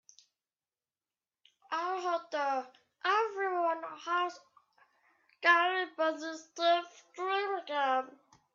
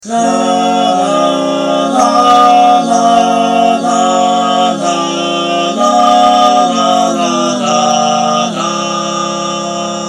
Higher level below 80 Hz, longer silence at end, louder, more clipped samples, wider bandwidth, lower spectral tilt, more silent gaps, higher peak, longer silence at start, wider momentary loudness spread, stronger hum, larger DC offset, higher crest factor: second, under -90 dBFS vs -56 dBFS; first, 0.45 s vs 0 s; second, -32 LUFS vs -10 LUFS; neither; second, 7.6 kHz vs 12 kHz; second, -1 dB/octave vs -3.5 dB/octave; neither; second, -12 dBFS vs 0 dBFS; first, 1.7 s vs 0.05 s; first, 12 LU vs 7 LU; neither; neither; first, 22 dB vs 10 dB